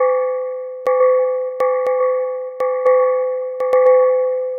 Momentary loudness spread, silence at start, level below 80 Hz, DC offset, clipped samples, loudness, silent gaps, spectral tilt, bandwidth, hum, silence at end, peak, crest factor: 9 LU; 0 s; -74 dBFS; under 0.1%; under 0.1%; -17 LUFS; none; -4 dB/octave; 2.9 kHz; none; 0 s; -4 dBFS; 12 dB